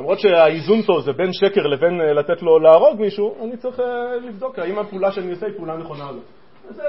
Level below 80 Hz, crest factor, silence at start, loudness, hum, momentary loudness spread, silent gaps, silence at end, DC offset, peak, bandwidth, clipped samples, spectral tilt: -64 dBFS; 18 dB; 0 s; -17 LUFS; none; 16 LU; none; 0 s; 0.5%; 0 dBFS; 5.8 kHz; under 0.1%; -4 dB/octave